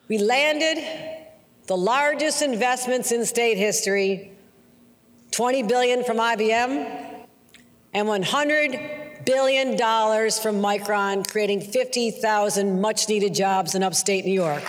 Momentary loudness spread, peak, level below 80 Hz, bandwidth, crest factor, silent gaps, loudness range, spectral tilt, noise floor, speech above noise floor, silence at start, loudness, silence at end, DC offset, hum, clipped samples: 9 LU; -6 dBFS; -72 dBFS; over 20 kHz; 16 dB; none; 2 LU; -3 dB/octave; -55 dBFS; 33 dB; 0.1 s; -22 LUFS; 0 s; under 0.1%; none; under 0.1%